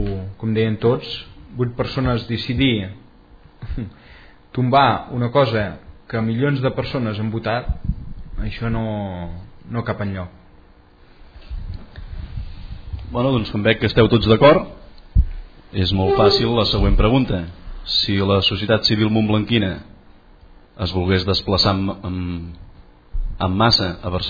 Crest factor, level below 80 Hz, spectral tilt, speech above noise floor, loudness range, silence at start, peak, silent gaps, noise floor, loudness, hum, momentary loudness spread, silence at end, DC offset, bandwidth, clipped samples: 20 dB; -30 dBFS; -7 dB/octave; 30 dB; 11 LU; 0 s; 0 dBFS; none; -48 dBFS; -19 LUFS; none; 19 LU; 0 s; under 0.1%; 5 kHz; under 0.1%